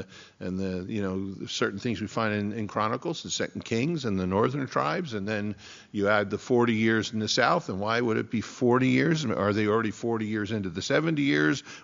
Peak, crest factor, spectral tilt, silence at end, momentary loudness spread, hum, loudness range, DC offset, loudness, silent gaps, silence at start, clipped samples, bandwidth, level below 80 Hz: -6 dBFS; 20 dB; -4.5 dB/octave; 0 s; 8 LU; none; 5 LU; under 0.1%; -27 LUFS; none; 0 s; under 0.1%; 7.4 kHz; -64 dBFS